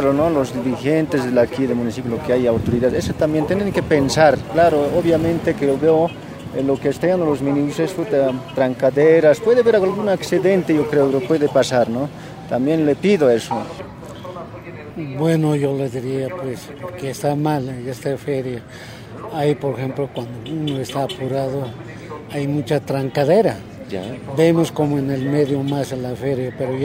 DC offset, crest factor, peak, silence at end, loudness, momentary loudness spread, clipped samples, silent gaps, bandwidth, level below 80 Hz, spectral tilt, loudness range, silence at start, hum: under 0.1%; 18 dB; 0 dBFS; 0 s; -19 LUFS; 14 LU; under 0.1%; none; 16 kHz; -46 dBFS; -6.5 dB/octave; 8 LU; 0 s; none